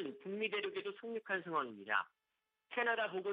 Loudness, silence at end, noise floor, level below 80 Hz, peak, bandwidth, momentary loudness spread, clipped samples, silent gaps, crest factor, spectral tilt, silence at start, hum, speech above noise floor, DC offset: -39 LUFS; 0 s; -83 dBFS; under -90 dBFS; -20 dBFS; 5 kHz; 8 LU; under 0.1%; none; 20 dB; -1 dB/octave; 0 s; none; 43 dB; under 0.1%